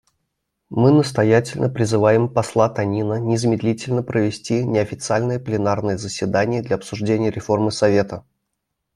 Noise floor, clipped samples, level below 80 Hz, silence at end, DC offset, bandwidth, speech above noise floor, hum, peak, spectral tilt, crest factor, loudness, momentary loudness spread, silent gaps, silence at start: -77 dBFS; under 0.1%; -54 dBFS; 0.75 s; under 0.1%; 12 kHz; 58 dB; none; -2 dBFS; -6.5 dB/octave; 18 dB; -19 LUFS; 7 LU; none; 0.7 s